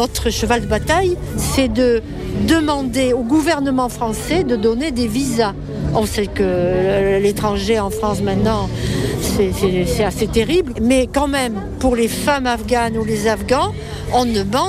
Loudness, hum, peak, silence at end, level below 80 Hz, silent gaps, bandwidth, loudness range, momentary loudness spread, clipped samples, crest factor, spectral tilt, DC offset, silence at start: -17 LUFS; none; -2 dBFS; 0 s; -30 dBFS; none; 16 kHz; 1 LU; 5 LU; under 0.1%; 14 dB; -5 dB/octave; under 0.1%; 0 s